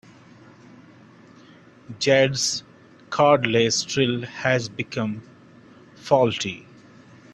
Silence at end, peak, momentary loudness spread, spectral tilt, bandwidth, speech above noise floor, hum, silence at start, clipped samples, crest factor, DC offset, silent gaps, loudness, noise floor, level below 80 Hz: 0.75 s; -2 dBFS; 13 LU; -4 dB/octave; 12 kHz; 28 dB; none; 1.9 s; under 0.1%; 22 dB; under 0.1%; none; -22 LUFS; -50 dBFS; -60 dBFS